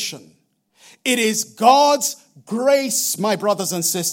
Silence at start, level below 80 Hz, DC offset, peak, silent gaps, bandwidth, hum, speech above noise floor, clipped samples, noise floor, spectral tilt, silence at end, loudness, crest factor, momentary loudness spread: 0 s; -74 dBFS; under 0.1%; 0 dBFS; none; 17 kHz; none; 37 dB; under 0.1%; -56 dBFS; -2.5 dB/octave; 0 s; -18 LUFS; 18 dB; 13 LU